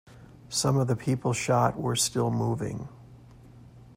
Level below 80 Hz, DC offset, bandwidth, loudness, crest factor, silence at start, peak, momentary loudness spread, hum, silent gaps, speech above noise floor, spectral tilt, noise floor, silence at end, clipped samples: -56 dBFS; under 0.1%; 16 kHz; -27 LUFS; 18 dB; 0.1 s; -10 dBFS; 9 LU; none; none; 24 dB; -5 dB/octave; -50 dBFS; 0.05 s; under 0.1%